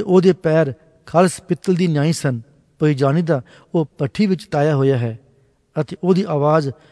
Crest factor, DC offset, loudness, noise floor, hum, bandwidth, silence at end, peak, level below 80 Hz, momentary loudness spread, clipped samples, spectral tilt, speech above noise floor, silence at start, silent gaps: 16 dB; under 0.1%; -18 LUFS; -56 dBFS; none; 11 kHz; 0.2 s; 0 dBFS; -58 dBFS; 9 LU; under 0.1%; -7 dB/octave; 39 dB; 0 s; none